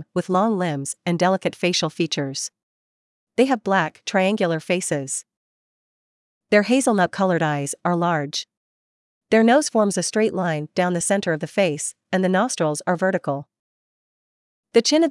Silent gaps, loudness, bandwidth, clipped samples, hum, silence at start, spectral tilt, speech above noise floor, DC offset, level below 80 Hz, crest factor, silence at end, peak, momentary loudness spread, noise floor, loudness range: 2.63-3.27 s, 5.37-6.41 s, 8.57-9.21 s, 13.59-14.63 s; -21 LUFS; 12 kHz; under 0.1%; none; 0 s; -4.5 dB/octave; over 70 dB; under 0.1%; -72 dBFS; 20 dB; 0 s; -2 dBFS; 9 LU; under -90 dBFS; 3 LU